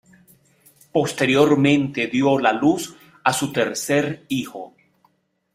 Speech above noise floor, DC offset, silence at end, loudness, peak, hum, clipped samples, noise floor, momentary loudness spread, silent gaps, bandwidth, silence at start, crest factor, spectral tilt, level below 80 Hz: 44 dB; under 0.1%; 0.85 s; -20 LUFS; -2 dBFS; none; under 0.1%; -64 dBFS; 11 LU; none; 16 kHz; 0.95 s; 18 dB; -5 dB/octave; -60 dBFS